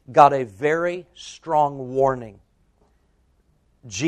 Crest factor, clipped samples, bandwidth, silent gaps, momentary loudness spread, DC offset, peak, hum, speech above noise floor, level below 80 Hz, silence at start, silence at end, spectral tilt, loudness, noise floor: 22 dB; under 0.1%; 11 kHz; none; 21 LU; under 0.1%; 0 dBFS; none; 42 dB; -56 dBFS; 0.1 s; 0 s; -5 dB/octave; -20 LUFS; -63 dBFS